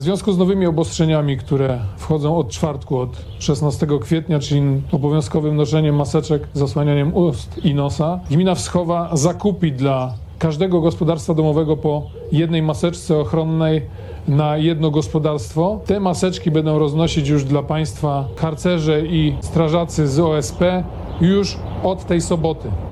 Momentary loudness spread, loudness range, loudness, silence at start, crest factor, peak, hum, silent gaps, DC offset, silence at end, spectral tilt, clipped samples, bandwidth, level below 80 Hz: 5 LU; 1 LU; -18 LUFS; 0 s; 16 dB; -2 dBFS; none; none; under 0.1%; 0 s; -7 dB/octave; under 0.1%; 12 kHz; -38 dBFS